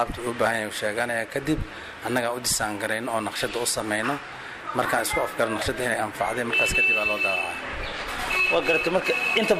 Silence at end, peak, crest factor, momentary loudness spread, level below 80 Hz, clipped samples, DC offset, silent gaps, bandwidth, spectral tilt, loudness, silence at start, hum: 0 s; -10 dBFS; 16 dB; 10 LU; -44 dBFS; under 0.1%; under 0.1%; none; 15.5 kHz; -3 dB/octave; -24 LUFS; 0 s; none